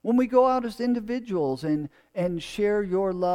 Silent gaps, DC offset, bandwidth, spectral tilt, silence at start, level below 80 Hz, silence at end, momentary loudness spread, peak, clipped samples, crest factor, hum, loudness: none; under 0.1%; 13.5 kHz; -7 dB/octave; 0.05 s; -54 dBFS; 0 s; 9 LU; -8 dBFS; under 0.1%; 18 dB; none; -26 LUFS